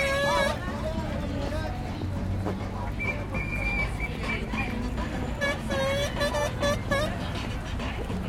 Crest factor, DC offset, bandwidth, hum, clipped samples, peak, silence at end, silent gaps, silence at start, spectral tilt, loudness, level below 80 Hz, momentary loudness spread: 16 dB; under 0.1%; 16.5 kHz; none; under 0.1%; -12 dBFS; 0 s; none; 0 s; -5 dB/octave; -29 LUFS; -36 dBFS; 7 LU